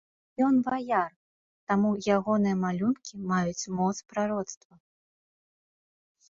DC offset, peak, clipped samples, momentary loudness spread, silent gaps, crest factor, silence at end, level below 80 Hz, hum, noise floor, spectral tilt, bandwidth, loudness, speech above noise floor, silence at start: under 0.1%; -12 dBFS; under 0.1%; 11 LU; 1.16-1.67 s; 18 dB; 1.75 s; -66 dBFS; none; under -90 dBFS; -6 dB/octave; 7.6 kHz; -28 LUFS; over 63 dB; 0.4 s